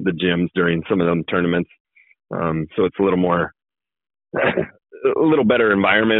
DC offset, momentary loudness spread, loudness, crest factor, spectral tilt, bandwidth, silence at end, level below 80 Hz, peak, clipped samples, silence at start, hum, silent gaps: under 0.1%; 10 LU; -19 LUFS; 16 dB; -4.5 dB/octave; 4.1 kHz; 0 s; -54 dBFS; -2 dBFS; under 0.1%; 0 s; none; 1.80-1.85 s